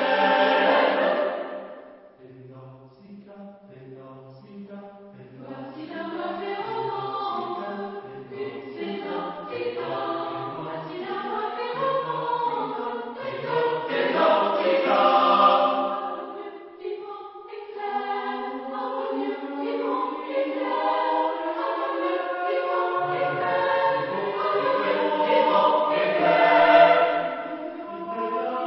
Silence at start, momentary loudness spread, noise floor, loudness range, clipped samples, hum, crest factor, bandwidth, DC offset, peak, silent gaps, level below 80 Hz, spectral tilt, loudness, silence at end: 0 s; 19 LU; -47 dBFS; 15 LU; under 0.1%; none; 22 dB; 5.8 kHz; under 0.1%; -4 dBFS; none; -74 dBFS; -9 dB/octave; -24 LUFS; 0 s